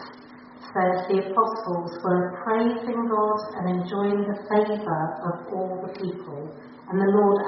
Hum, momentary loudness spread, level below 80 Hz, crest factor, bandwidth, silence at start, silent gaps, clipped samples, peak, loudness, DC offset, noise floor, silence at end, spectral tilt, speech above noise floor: none; 13 LU; -68 dBFS; 16 dB; 5.8 kHz; 0 s; none; under 0.1%; -8 dBFS; -25 LUFS; under 0.1%; -45 dBFS; 0 s; -6.5 dB/octave; 21 dB